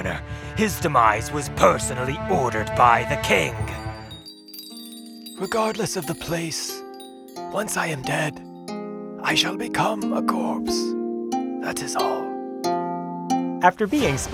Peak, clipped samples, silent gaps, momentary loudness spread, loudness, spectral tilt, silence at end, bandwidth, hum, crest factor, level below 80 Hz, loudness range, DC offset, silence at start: 0 dBFS; under 0.1%; none; 18 LU; -23 LUFS; -4 dB/octave; 0 s; over 20 kHz; none; 24 dB; -46 dBFS; 8 LU; under 0.1%; 0 s